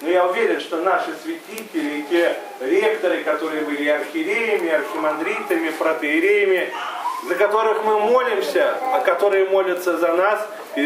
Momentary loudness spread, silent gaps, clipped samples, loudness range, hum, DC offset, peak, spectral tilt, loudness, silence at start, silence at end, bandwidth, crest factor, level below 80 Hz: 8 LU; none; under 0.1%; 3 LU; none; under 0.1%; -4 dBFS; -3.5 dB/octave; -20 LUFS; 0 s; 0 s; 16 kHz; 16 dB; -82 dBFS